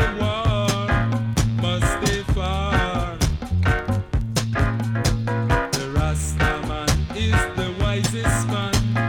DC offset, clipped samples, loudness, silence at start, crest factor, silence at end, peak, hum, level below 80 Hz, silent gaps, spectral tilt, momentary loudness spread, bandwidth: under 0.1%; under 0.1%; -22 LUFS; 0 s; 14 dB; 0 s; -6 dBFS; none; -28 dBFS; none; -5 dB/octave; 3 LU; 18 kHz